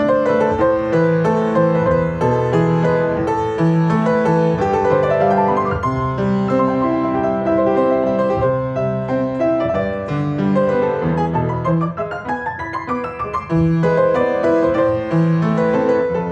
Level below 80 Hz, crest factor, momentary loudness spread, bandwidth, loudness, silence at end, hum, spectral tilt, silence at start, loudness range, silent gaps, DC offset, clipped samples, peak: -42 dBFS; 14 dB; 6 LU; 8 kHz; -17 LUFS; 0 s; none; -8.5 dB/octave; 0 s; 3 LU; none; under 0.1%; under 0.1%; -2 dBFS